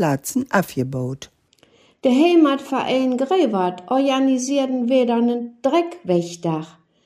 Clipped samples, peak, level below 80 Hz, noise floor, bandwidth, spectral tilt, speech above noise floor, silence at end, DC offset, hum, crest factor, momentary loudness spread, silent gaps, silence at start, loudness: under 0.1%; -4 dBFS; -64 dBFS; -56 dBFS; 15.5 kHz; -5.5 dB/octave; 37 dB; 0.4 s; under 0.1%; none; 16 dB; 9 LU; none; 0 s; -20 LUFS